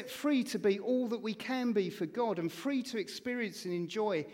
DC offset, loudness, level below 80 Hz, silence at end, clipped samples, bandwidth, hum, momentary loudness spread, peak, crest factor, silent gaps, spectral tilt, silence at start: under 0.1%; -34 LUFS; -80 dBFS; 0 s; under 0.1%; 16.5 kHz; none; 6 LU; -18 dBFS; 16 dB; none; -5 dB/octave; 0 s